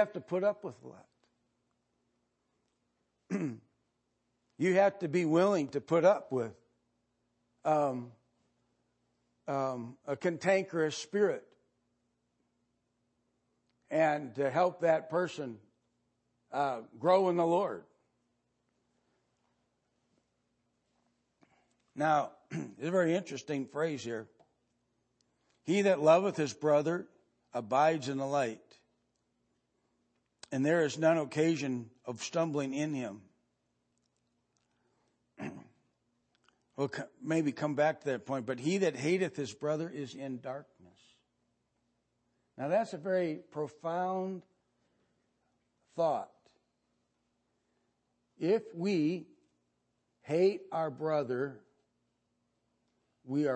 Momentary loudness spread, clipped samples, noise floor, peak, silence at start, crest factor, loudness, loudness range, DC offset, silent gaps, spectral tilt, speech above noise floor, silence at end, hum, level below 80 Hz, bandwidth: 14 LU; under 0.1%; -80 dBFS; -12 dBFS; 0 s; 22 dB; -32 LUFS; 11 LU; under 0.1%; none; -6 dB/octave; 49 dB; 0 s; 60 Hz at -75 dBFS; -84 dBFS; 8.8 kHz